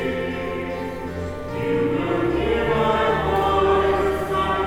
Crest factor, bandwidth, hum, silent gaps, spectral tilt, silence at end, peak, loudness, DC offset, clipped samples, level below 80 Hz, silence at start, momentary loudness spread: 14 dB; 16.5 kHz; none; none; -6.5 dB/octave; 0 s; -8 dBFS; -22 LUFS; under 0.1%; under 0.1%; -36 dBFS; 0 s; 11 LU